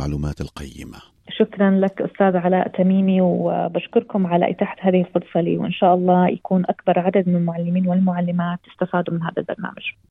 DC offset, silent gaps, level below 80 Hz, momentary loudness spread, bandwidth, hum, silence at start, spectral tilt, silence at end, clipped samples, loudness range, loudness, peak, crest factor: under 0.1%; none; -46 dBFS; 11 LU; 6.8 kHz; none; 0 s; -9 dB/octave; 0.2 s; under 0.1%; 2 LU; -20 LUFS; -4 dBFS; 16 dB